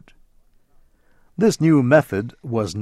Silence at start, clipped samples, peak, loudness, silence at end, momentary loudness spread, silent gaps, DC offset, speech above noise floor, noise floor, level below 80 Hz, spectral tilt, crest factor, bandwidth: 1.4 s; under 0.1%; -2 dBFS; -18 LUFS; 0 s; 12 LU; none; under 0.1%; 37 dB; -55 dBFS; -54 dBFS; -6.5 dB/octave; 18 dB; 14 kHz